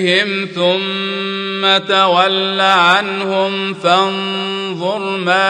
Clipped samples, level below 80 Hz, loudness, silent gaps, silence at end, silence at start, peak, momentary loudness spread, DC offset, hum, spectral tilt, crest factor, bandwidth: under 0.1%; -66 dBFS; -14 LUFS; none; 0 s; 0 s; 0 dBFS; 9 LU; under 0.1%; none; -4 dB/octave; 14 dB; 10 kHz